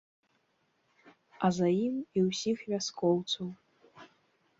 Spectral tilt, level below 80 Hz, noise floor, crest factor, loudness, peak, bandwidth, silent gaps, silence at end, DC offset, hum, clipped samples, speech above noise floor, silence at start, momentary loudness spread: -5.5 dB/octave; -74 dBFS; -75 dBFS; 20 dB; -31 LUFS; -14 dBFS; 7.8 kHz; none; 0.55 s; under 0.1%; none; under 0.1%; 44 dB; 1.05 s; 6 LU